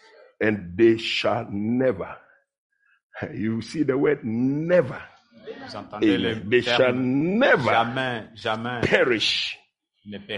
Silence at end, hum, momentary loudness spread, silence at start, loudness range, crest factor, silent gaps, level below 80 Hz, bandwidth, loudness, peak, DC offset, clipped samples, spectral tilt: 0 s; none; 17 LU; 0.4 s; 5 LU; 20 dB; 2.58-2.70 s, 3.03-3.10 s; -58 dBFS; 11 kHz; -22 LUFS; -4 dBFS; under 0.1%; under 0.1%; -5.5 dB/octave